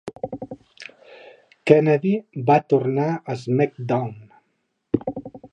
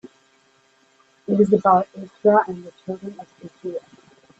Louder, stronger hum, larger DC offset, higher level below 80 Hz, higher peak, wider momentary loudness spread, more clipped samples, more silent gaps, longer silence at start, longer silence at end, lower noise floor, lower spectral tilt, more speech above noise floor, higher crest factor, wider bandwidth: about the same, -21 LUFS vs -20 LUFS; neither; neither; about the same, -60 dBFS vs -64 dBFS; first, 0 dBFS vs -4 dBFS; about the same, 21 LU vs 21 LU; neither; neither; second, 0.05 s vs 1.3 s; second, 0.05 s vs 0.6 s; first, -72 dBFS vs -60 dBFS; about the same, -8.5 dB/octave vs -8.5 dB/octave; first, 53 dB vs 39 dB; about the same, 22 dB vs 20 dB; about the same, 8.8 kHz vs 8 kHz